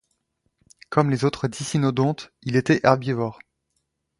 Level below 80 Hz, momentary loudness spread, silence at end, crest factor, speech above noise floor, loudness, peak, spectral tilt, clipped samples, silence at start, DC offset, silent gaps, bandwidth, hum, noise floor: -58 dBFS; 9 LU; 0.85 s; 22 dB; 53 dB; -23 LUFS; 0 dBFS; -6.5 dB/octave; under 0.1%; 0.9 s; under 0.1%; none; 11.5 kHz; none; -75 dBFS